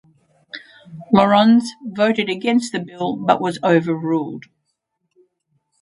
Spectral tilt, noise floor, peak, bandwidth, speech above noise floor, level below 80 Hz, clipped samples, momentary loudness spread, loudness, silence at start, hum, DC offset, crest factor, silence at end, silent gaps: -6 dB/octave; -73 dBFS; 0 dBFS; 11 kHz; 56 dB; -60 dBFS; under 0.1%; 23 LU; -18 LUFS; 0.55 s; none; under 0.1%; 20 dB; 1.4 s; none